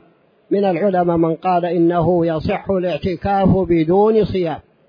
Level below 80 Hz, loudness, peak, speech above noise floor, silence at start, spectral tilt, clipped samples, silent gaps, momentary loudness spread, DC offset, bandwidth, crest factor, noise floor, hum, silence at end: -40 dBFS; -17 LUFS; -2 dBFS; 38 dB; 0.5 s; -10 dB/octave; under 0.1%; none; 7 LU; under 0.1%; 5.2 kHz; 14 dB; -54 dBFS; none; 0.3 s